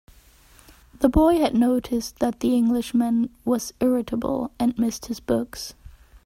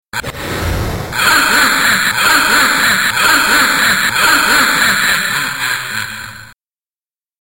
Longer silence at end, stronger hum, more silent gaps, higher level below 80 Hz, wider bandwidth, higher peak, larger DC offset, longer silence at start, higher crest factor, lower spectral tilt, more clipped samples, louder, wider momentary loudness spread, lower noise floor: second, 0.35 s vs 0.95 s; neither; neither; second, -42 dBFS vs -34 dBFS; about the same, 16 kHz vs 16.5 kHz; second, -6 dBFS vs -2 dBFS; second, under 0.1% vs 0.4%; first, 1 s vs 0.15 s; first, 18 dB vs 12 dB; first, -5.5 dB/octave vs -1.5 dB/octave; neither; second, -23 LUFS vs -11 LUFS; second, 9 LU vs 12 LU; second, -52 dBFS vs under -90 dBFS